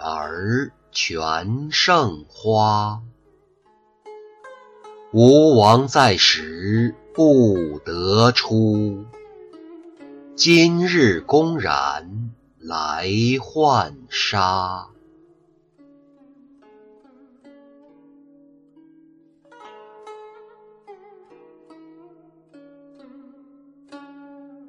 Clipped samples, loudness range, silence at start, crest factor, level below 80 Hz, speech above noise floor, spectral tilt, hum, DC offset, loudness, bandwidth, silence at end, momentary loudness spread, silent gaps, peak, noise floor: under 0.1%; 8 LU; 0 s; 20 dB; -54 dBFS; 41 dB; -5 dB/octave; none; under 0.1%; -18 LUFS; 11.5 kHz; 0.25 s; 15 LU; none; -2 dBFS; -59 dBFS